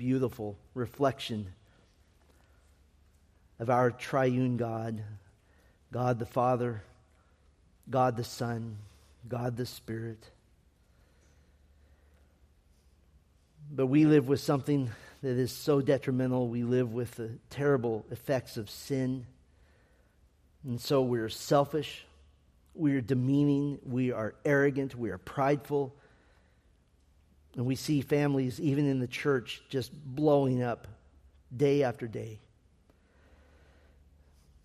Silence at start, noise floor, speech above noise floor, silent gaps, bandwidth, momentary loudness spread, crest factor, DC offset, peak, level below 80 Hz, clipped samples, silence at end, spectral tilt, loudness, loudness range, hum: 0 s; -65 dBFS; 35 dB; none; 15 kHz; 14 LU; 20 dB; under 0.1%; -12 dBFS; -64 dBFS; under 0.1%; 2.25 s; -7 dB/octave; -31 LUFS; 7 LU; none